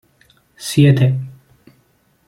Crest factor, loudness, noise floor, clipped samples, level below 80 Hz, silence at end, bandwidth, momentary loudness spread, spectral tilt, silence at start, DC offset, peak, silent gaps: 16 dB; -15 LUFS; -58 dBFS; under 0.1%; -54 dBFS; 0.95 s; 15 kHz; 18 LU; -6.5 dB/octave; 0.6 s; under 0.1%; -2 dBFS; none